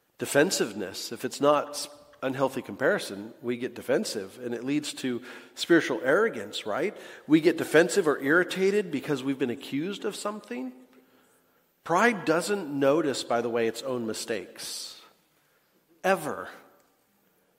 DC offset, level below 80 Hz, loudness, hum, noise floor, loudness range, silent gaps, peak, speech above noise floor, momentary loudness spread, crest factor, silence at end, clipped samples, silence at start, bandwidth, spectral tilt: under 0.1%; -76 dBFS; -27 LUFS; none; -67 dBFS; 7 LU; none; -6 dBFS; 40 dB; 13 LU; 22 dB; 1 s; under 0.1%; 0.2 s; 16 kHz; -4 dB/octave